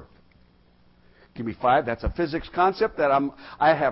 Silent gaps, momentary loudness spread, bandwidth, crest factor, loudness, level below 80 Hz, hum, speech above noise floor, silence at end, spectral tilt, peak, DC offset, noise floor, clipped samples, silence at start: none; 9 LU; 5.8 kHz; 16 dB; -24 LUFS; -42 dBFS; none; 35 dB; 0 s; -10 dB/octave; -8 dBFS; under 0.1%; -58 dBFS; under 0.1%; 0 s